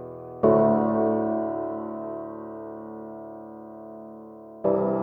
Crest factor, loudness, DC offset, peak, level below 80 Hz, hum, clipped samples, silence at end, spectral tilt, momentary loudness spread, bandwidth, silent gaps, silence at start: 20 dB; -25 LUFS; under 0.1%; -8 dBFS; -60 dBFS; none; under 0.1%; 0 s; -12 dB/octave; 21 LU; 3.1 kHz; none; 0 s